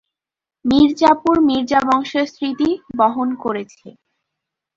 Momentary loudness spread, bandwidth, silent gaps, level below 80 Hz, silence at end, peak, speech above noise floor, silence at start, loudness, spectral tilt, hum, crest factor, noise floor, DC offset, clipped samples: 11 LU; 7.6 kHz; none; -50 dBFS; 0.85 s; -2 dBFS; 72 dB; 0.65 s; -17 LUFS; -5.5 dB/octave; none; 16 dB; -88 dBFS; under 0.1%; under 0.1%